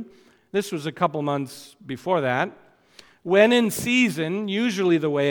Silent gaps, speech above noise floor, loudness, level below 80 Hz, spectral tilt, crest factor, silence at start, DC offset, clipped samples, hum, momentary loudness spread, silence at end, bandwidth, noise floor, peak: none; 31 dB; -22 LUFS; -66 dBFS; -5 dB/octave; 20 dB; 0 s; under 0.1%; under 0.1%; none; 17 LU; 0 s; 19 kHz; -53 dBFS; -4 dBFS